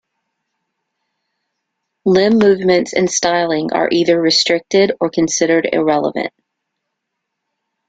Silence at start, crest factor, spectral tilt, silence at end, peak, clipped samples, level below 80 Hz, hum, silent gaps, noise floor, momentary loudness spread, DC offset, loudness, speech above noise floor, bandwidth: 2.05 s; 16 dB; -3.5 dB/octave; 1.6 s; 0 dBFS; under 0.1%; -56 dBFS; none; none; -76 dBFS; 5 LU; under 0.1%; -14 LUFS; 62 dB; 9.2 kHz